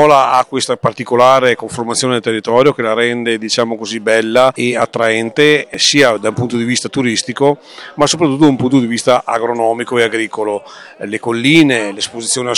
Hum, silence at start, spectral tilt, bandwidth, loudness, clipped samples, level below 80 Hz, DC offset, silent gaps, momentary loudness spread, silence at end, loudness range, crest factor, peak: none; 0 s; -4 dB/octave; 16 kHz; -13 LUFS; 0.6%; -54 dBFS; under 0.1%; none; 9 LU; 0 s; 2 LU; 12 dB; 0 dBFS